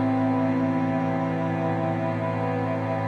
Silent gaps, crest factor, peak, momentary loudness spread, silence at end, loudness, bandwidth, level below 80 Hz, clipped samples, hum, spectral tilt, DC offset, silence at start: none; 10 dB; -14 dBFS; 3 LU; 0 s; -25 LUFS; 6.8 kHz; -58 dBFS; under 0.1%; none; -9 dB/octave; under 0.1%; 0 s